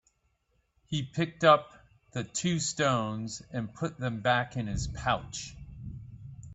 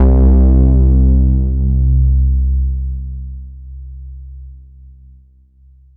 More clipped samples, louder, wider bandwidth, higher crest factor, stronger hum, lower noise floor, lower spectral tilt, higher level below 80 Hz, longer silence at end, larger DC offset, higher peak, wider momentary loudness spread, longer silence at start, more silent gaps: neither; second, -30 LUFS vs -13 LUFS; first, 8.4 kHz vs 1.4 kHz; first, 24 dB vs 10 dB; neither; first, -74 dBFS vs -46 dBFS; second, -4.5 dB/octave vs -15 dB/octave; second, -50 dBFS vs -14 dBFS; second, 0 s vs 1.4 s; neither; second, -8 dBFS vs -2 dBFS; second, 19 LU vs 23 LU; first, 0.9 s vs 0 s; neither